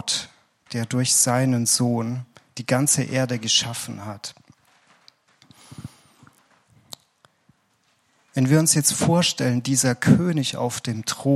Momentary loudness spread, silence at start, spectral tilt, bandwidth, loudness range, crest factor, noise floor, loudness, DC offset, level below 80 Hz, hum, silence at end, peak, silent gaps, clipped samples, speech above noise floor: 22 LU; 0.05 s; -4 dB/octave; 15.5 kHz; 15 LU; 22 dB; -66 dBFS; -21 LUFS; under 0.1%; -62 dBFS; none; 0 s; -2 dBFS; none; under 0.1%; 45 dB